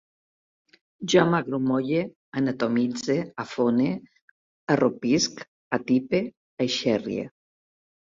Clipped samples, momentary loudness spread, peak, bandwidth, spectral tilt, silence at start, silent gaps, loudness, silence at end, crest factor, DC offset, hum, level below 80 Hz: under 0.1%; 11 LU; -4 dBFS; 7.6 kHz; -5 dB/octave; 1 s; 2.16-2.32 s, 4.22-4.67 s, 5.48-5.71 s, 6.37-6.57 s; -25 LUFS; 0.8 s; 22 dB; under 0.1%; none; -64 dBFS